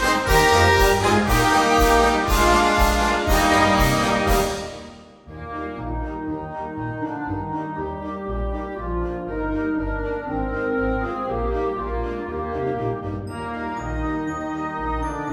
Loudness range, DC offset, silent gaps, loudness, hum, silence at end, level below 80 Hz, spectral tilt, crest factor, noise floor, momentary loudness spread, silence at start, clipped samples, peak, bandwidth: 11 LU; under 0.1%; none; -21 LUFS; none; 0 s; -30 dBFS; -4.5 dB/octave; 18 dB; -41 dBFS; 13 LU; 0 s; under 0.1%; -4 dBFS; over 20 kHz